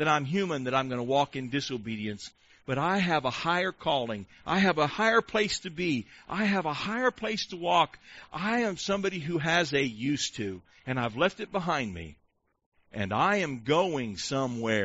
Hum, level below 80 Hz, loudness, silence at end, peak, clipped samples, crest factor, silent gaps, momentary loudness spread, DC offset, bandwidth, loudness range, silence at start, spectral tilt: none; -60 dBFS; -29 LUFS; 0 s; -10 dBFS; under 0.1%; 20 dB; 12.66-12.72 s; 11 LU; under 0.1%; 8 kHz; 3 LU; 0 s; -3.5 dB/octave